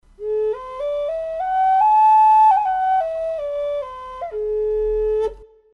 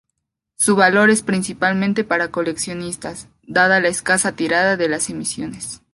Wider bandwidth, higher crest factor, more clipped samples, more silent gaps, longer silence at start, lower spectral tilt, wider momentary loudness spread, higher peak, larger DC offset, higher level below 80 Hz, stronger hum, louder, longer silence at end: second, 6.4 kHz vs 12 kHz; second, 12 dB vs 18 dB; neither; neither; second, 0.2 s vs 0.6 s; about the same, -4.5 dB/octave vs -3.5 dB/octave; about the same, 14 LU vs 14 LU; second, -8 dBFS vs -2 dBFS; neither; first, -44 dBFS vs -54 dBFS; neither; about the same, -18 LUFS vs -17 LUFS; first, 0.3 s vs 0.15 s